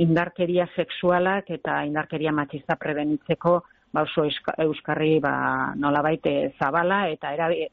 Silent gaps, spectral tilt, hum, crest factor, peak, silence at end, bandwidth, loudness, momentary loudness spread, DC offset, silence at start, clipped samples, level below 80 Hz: none; -4.5 dB/octave; none; 16 dB; -8 dBFS; 0.05 s; 5.4 kHz; -24 LUFS; 6 LU; under 0.1%; 0 s; under 0.1%; -58 dBFS